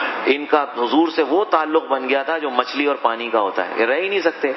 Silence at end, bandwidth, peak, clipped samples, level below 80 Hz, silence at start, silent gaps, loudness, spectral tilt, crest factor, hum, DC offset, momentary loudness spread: 0 s; 6 kHz; 0 dBFS; under 0.1%; -90 dBFS; 0 s; none; -19 LUFS; -4.5 dB/octave; 18 dB; none; under 0.1%; 3 LU